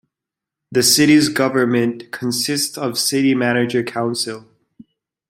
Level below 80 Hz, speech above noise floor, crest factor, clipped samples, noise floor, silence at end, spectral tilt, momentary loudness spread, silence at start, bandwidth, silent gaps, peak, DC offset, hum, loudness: -60 dBFS; 68 dB; 18 dB; under 0.1%; -85 dBFS; 0.9 s; -3.5 dB/octave; 11 LU; 0.7 s; 16.5 kHz; none; -2 dBFS; under 0.1%; none; -17 LUFS